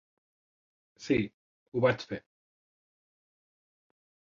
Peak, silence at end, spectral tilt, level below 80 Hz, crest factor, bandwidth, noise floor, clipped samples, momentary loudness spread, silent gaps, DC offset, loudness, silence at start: -12 dBFS; 2.05 s; -6.5 dB/octave; -64 dBFS; 24 dB; 7.6 kHz; under -90 dBFS; under 0.1%; 14 LU; 1.34-1.72 s; under 0.1%; -31 LUFS; 1 s